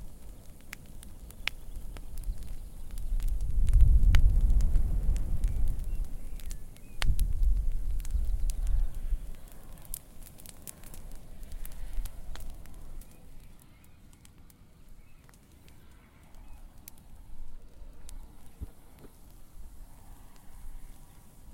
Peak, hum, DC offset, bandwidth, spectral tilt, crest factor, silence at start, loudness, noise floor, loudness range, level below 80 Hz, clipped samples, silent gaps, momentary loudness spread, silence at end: -6 dBFS; none; under 0.1%; 17 kHz; -5 dB/octave; 24 dB; 0 s; -34 LUFS; -55 dBFS; 24 LU; -32 dBFS; under 0.1%; none; 25 LU; 0 s